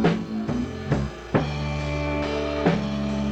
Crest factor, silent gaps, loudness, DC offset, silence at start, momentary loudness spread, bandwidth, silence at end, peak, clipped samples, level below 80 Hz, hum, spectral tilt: 18 dB; none; -26 LUFS; under 0.1%; 0 s; 5 LU; 8.8 kHz; 0 s; -8 dBFS; under 0.1%; -36 dBFS; none; -7 dB/octave